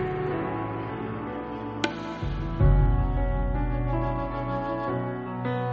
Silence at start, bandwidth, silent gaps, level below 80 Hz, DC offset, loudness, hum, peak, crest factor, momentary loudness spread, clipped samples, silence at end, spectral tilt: 0 s; 7.4 kHz; none; -30 dBFS; under 0.1%; -29 LUFS; none; -8 dBFS; 18 dB; 9 LU; under 0.1%; 0 s; -6.5 dB/octave